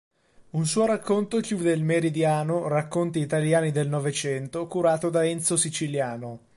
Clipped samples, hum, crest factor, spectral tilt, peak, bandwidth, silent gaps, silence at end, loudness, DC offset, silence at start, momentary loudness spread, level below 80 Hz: under 0.1%; none; 16 dB; -5 dB/octave; -10 dBFS; 11.5 kHz; none; 0.2 s; -25 LUFS; under 0.1%; 0.4 s; 6 LU; -66 dBFS